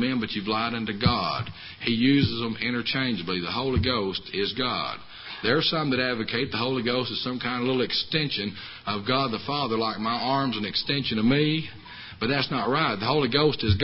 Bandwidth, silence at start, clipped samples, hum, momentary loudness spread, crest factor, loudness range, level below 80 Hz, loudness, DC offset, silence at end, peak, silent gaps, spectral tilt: 5.8 kHz; 0 s; under 0.1%; none; 8 LU; 18 dB; 1 LU; -46 dBFS; -25 LUFS; under 0.1%; 0 s; -6 dBFS; none; -9.5 dB/octave